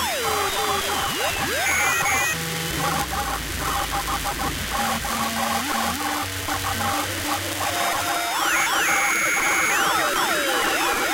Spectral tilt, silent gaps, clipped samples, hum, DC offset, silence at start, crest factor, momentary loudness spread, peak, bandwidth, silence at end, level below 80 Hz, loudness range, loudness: -2 dB/octave; none; under 0.1%; none; under 0.1%; 0 s; 16 dB; 6 LU; -6 dBFS; 16 kHz; 0 s; -42 dBFS; 4 LU; -22 LUFS